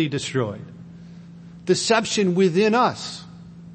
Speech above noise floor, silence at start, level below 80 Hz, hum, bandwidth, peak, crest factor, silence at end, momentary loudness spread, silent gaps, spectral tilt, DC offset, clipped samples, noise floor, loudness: 21 dB; 0 s; -60 dBFS; none; 8.8 kHz; -4 dBFS; 18 dB; 0 s; 24 LU; none; -4.5 dB/octave; under 0.1%; under 0.1%; -42 dBFS; -21 LUFS